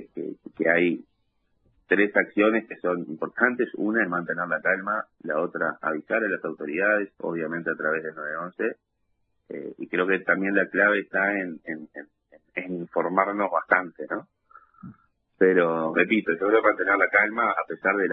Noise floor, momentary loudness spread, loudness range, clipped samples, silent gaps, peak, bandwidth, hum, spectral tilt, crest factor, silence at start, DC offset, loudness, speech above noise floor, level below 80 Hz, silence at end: -74 dBFS; 13 LU; 5 LU; under 0.1%; none; -2 dBFS; 3.9 kHz; none; -9 dB/octave; 22 dB; 0 s; under 0.1%; -24 LUFS; 50 dB; -70 dBFS; 0 s